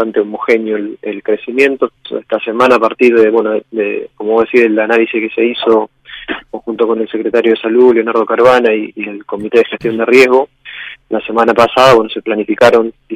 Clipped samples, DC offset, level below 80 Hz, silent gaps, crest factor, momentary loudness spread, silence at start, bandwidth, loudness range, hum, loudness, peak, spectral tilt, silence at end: 0.6%; under 0.1%; -52 dBFS; none; 12 dB; 14 LU; 0 s; 14 kHz; 3 LU; none; -11 LUFS; 0 dBFS; -5 dB/octave; 0 s